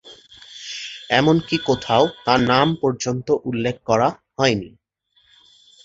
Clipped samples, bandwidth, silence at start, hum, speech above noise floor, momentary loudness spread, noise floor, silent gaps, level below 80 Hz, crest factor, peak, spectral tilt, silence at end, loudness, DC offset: under 0.1%; 8 kHz; 0.05 s; none; 43 dB; 14 LU; -62 dBFS; none; -52 dBFS; 20 dB; -2 dBFS; -5 dB/octave; 1.15 s; -20 LUFS; under 0.1%